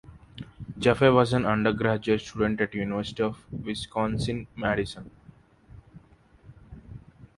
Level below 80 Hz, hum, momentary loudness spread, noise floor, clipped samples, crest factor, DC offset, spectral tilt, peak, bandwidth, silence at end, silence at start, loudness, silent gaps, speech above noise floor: -50 dBFS; none; 24 LU; -56 dBFS; under 0.1%; 24 dB; under 0.1%; -6.5 dB/octave; -4 dBFS; 11.5 kHz; 0.15 s; 0.1 s; -26 LUFS; none; 31 dB